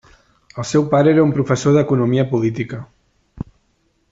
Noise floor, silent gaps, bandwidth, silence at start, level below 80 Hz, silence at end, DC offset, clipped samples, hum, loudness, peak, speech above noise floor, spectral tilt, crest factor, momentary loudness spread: -63 dBFS; none; 8 kHz; 0.55 s; -50 dBFS; 0.7 s; under 0.1%; under 0.1%; none; -16 LUFS; -4 dBFS; 47 dB; -7 dB/octave; 14 dB; 20 LU